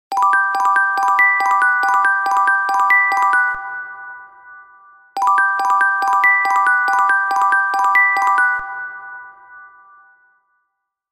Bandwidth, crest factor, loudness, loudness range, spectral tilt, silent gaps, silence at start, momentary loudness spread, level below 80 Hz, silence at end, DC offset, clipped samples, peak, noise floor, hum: 16 kHz; 14 dB; -14 LUFS; 4 LU; 0.5 dB/octave; none; 0.1 s; 16 LU; -64 dBFS; 1.45 s; under 0.1%; under 0.1%; -4 dBFS; -74 dBFS; none